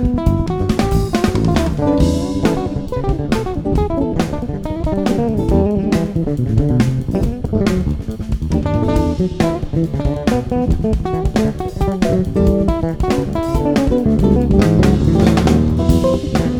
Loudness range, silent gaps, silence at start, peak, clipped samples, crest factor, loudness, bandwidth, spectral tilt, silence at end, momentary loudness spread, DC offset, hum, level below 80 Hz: 4 LU; none; 0 s; 0 dBFS; under 0.1%; 14 dB; -16 LUFS; 17.5 kHz; -7.5 dB/octave; 0 s; 7 LU; under 0.1%; none; -22 dBFS